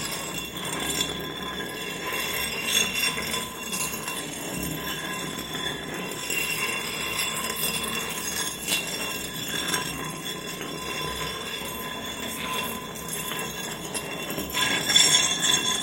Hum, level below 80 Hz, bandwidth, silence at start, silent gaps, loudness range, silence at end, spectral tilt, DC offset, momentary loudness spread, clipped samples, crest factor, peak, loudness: none; -52 dBFS; 17 kHz; 0 s; none; 6 LU; 0 s; -1 dB/octave; under 0.1%; 11 LU; under 0.1%; 24 dB; -4 dBFS; -26 LUFS